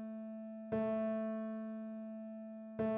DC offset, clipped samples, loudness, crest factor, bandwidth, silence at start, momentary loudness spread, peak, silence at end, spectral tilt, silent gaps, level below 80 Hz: under 0.1%; under 0.1%; -42 LUFS; 14 dB; 3.8 kHz; 0 s; 11 LU; -28 dBFS; 0 s; -8 dB/octave; none; -74 dBFS